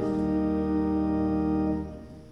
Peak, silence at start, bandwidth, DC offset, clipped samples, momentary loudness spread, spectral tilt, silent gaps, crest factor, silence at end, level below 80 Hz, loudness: -16 dBFS; 0 s; 6 kHz; under 0.1%; under 0.1%; 8 LU; -10 dB/octave; none; 12 dB; 0 s; -42 dBFS; -27 LUFS